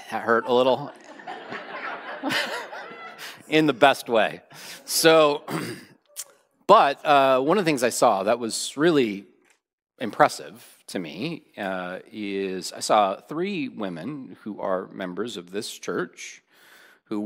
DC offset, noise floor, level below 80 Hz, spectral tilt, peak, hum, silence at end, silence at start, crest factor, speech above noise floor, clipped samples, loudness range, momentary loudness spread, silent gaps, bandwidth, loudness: under 0.1%; -65 dBFS; -74 dBFS; -3.5 dB/octave; -2 dBFS; none; 0 s; 0 s; 24 dB; 42 dB; under 0.1%; 8 LU; 20 LU; 9.73-9.78 s; 16 kHz; -23 LUFS